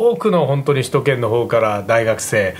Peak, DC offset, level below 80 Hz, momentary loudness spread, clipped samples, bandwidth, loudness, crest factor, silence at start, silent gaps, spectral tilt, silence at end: 0 dBFS; under 0.1%; -54 dBFS; 1 LU; under 0.1%; 16 kHz; -16 LUFS; 16 dB; 0 s; none; -5.5 dB/octave; 0 s